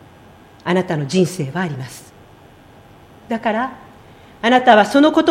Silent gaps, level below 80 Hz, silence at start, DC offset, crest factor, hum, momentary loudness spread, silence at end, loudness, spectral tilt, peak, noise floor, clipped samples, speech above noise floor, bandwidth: none; -56 dBFS; 0.65 s; under 0.1%; 18 dB; none; 17 LU; 0 s; -16 LUFS; -5.5 dB/octave; 0 dBFS; -45 dBFS; under 0.1%; 29 dB; 16 kHz